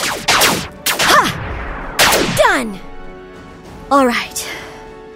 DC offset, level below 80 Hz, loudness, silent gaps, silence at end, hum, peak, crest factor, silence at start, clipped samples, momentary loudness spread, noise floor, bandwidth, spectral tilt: under 0.1%; -34 dBFS; -14 LUFS; none; 0 s; none; 0 dBFS; 16 dB; 0 s; under 0.1%; 24 LU; -35 dBFS; 16.5 kHz; -2 dB/octave